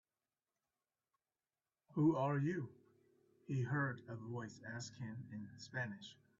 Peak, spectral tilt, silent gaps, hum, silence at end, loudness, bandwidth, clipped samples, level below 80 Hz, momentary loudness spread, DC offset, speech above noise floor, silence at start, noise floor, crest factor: -24 dBFS; -6.5 dB/octave; none; none; 0.25 s; -42 LUFS; 7.4 kHz; under 0.1%; -80 dBFS; 15 LU; under 0.1%; over 49 dB; 1.9 s; under -90 dBFS; 20 dB